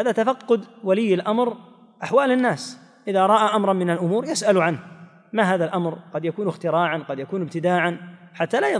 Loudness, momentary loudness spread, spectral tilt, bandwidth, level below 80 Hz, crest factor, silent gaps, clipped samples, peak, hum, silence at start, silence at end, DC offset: -22 LUFS; 11 LU; -5.5 dB/octave; 10.5 kHz; -76 dBFS; 16 dB; none; under 0.1%; -6 dBFS; none; 0 s; 0 s; under 0.1%